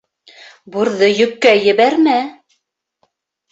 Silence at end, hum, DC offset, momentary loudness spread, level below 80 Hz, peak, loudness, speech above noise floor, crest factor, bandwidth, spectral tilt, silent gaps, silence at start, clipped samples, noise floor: 1.2 s; none; under 0.1%; 10 LU; -62 dBFS; 0 dBFS; -13 LUFS; 57 dB; 16 dB; 8 kHz; -4.5 dB/octave; none; 0.7 s; under 0.1%; -70 dBFS